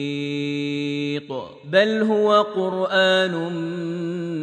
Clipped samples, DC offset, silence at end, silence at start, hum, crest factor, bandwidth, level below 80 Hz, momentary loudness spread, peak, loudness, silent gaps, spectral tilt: under 0.1%; under 0.1%; 0 s; 0 s; none; 18 dB; 9.6 kHz; -72 dBFS; 10 LU; -4 dBFS; -21 LUFS; none; -5.5 dB/octave